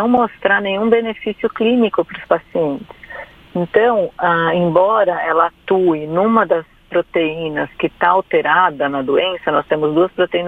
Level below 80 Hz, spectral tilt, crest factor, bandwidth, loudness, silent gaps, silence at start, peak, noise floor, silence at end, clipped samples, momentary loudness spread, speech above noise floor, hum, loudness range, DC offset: -52 dBFS; -8 dB/octave; 16 dB; 4.5 kHz; -16 LUFS; none; 0 s; 0 dBFS; -35 dBFS; 0 s; under 0.1%; 8 LU; 19 dB; none; 3 LU; under 0.1%